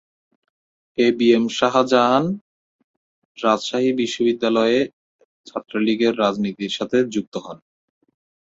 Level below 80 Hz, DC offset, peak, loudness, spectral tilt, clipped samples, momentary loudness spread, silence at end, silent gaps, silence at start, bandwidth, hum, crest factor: -64 dBFS; under 0.1%; -2 dBFS; -19 LUFS; -5 dB/octave; under 0.1%; 15 LU; 0.9 s; 2.41-3.35 s, 4.93-5.19 s, 5.25-5.44 s, 7.27-7.32 s; 1 s; 7.8 kHz; none; 20 dB